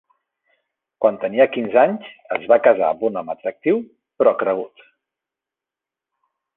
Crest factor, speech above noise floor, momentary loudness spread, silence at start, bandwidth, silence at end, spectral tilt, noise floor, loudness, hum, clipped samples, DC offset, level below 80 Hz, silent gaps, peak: 18 dB; 69 dB; 12 LU; 1 s; 4 kHz; 1.9 s; -8.5 dB/octave; -88 dBFS; -19 LUFS; none; under 0.1%; under 0.1%; -70 dBFS; none; -2 dBFS